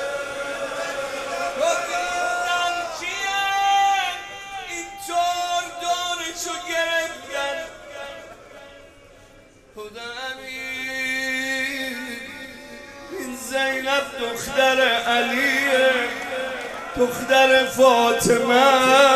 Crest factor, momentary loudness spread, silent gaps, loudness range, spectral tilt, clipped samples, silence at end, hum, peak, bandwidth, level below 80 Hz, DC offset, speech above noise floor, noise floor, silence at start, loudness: 20 dB; 17 LU; none; 11 LU; -2 dB/octave; under 0.1%; 0 s; none; -2 dBFS; 15.5 kHz; -54 dBFS; under 0.1%; 33 dB; -49 dBFS; 0 s; -21 LUFS